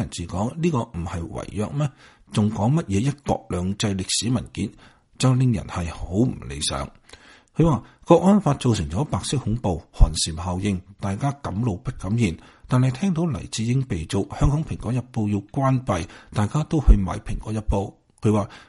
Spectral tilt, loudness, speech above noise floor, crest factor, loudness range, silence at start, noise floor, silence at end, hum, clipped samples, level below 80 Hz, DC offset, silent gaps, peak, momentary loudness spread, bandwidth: -6 dB/octave; -24 LUFS; 27 dB; 20 dB; 3 LU; 0 s; -49 dBFS; 0.05 s; none; under 0.1%; -30 dBFS; under 0.1%; none; -2 dBFS; 10 LU; 11.5 kHz